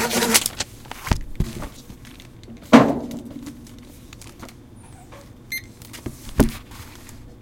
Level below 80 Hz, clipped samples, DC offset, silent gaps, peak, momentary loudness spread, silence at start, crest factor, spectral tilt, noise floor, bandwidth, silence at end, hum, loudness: -36 dBFS; under 0.1%; under 0.1%; none; 0 dBFS; 27 LU; 0 s; 24 dB; -4 dB/octave; -43 dBFS; 17 kHz; 0.1 s; none; -21 LUFS